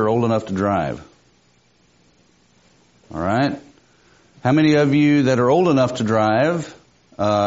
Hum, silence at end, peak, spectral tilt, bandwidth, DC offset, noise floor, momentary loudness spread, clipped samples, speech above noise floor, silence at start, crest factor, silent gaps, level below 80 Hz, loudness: 60 Hz at -50 dBFS; 0 s; -4 dBFS; -6 dB/octave; 8 kHz; under 0.1%; -58 dBFS; 12 LU; under 0.1%; 41 dB; 0 s; 16 dB; none; -54 dBFS; -18 LUFS